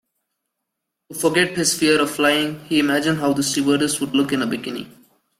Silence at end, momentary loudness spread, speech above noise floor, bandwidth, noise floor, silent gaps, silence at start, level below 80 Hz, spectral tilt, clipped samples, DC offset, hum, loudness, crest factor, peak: 0.5 s; 8 LU; 60 dB; 16 kHz; -80 dBFS; none; 1.1 s; -60 dBFS; -3.5 dB/octave; under 0.1%; under 0.1%; none; -19 LUFS; 18 dB; -2 dBFS